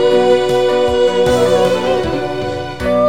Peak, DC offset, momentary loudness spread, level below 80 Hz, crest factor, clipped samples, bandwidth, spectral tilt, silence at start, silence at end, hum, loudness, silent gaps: 0 dBFS; 2%; 8 LU; -36 dBFS; 12 dB; under 0.1%; 15.5 kHz; -5.5 dB/octave; 0 s; 0 s; none; -14 LUFS; none